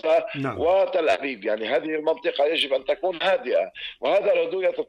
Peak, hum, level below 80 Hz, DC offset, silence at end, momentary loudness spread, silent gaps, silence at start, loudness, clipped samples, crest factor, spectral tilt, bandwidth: -12 dBFS; none; -62 dBFS; under 0.1%; 0.05 s; 6 LU; none; 0.05 s; -23 LUFS; under 0.1%; 12 dB; -5 dB/octave; 10.5 kHz